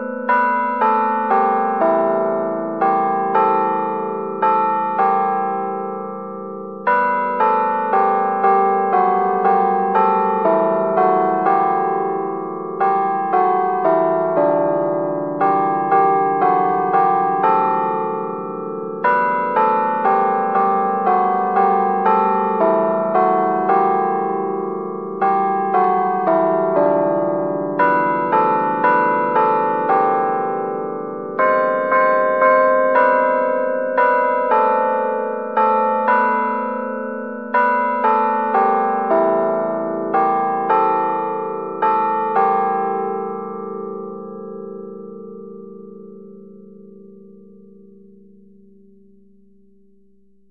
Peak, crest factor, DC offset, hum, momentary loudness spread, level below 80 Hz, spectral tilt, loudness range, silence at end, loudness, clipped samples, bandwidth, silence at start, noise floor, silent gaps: -2 dBFS; 16 dB; 0.3%; none; 10 LU; -72 dBFS; -5.5 dB/octave; 4 LU; 3.25 s; -17 LUFS; under 0.1%; 5.2 kHz; 0 s; -58 dBFS; none